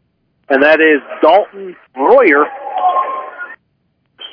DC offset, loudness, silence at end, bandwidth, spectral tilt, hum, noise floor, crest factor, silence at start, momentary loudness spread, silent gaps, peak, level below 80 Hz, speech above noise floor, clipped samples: under 0.1%; -11 LUFS; 0.05 s; 5.4 kHz; -6 dB/octave; none; -63 dBFS; 14 dB; 0.5 s; 21 LU; none; 0 dBFS; -62 dBFS; 52 dB; 0.2%